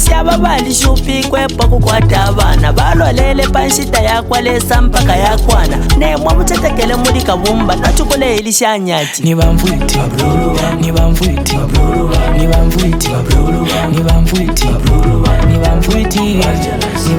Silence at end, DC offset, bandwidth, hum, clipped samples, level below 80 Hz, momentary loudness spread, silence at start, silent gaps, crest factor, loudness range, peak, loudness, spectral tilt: 0 s; under 0.1%; 18 kHz; none; under 0.1%; -14 dBFS; 3 LU; 0 s; none; 10 dB; 1 LU; 0 dBFS; -11 LUFS; -5 dB/octave